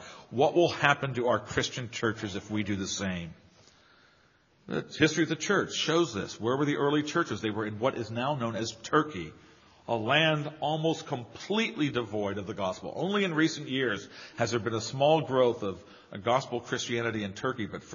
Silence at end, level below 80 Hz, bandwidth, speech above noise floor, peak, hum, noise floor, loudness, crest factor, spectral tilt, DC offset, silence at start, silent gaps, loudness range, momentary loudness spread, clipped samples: 0 s; -64 dBFS; 7.2 kHz; 35 dB; -6 dBFS; none; -64 dBFS; -29 LUFS; 24 dB; -3.5 dB/octave; under 0.1%; 0 s; none; 4 LU; 12 LU; under 0.1%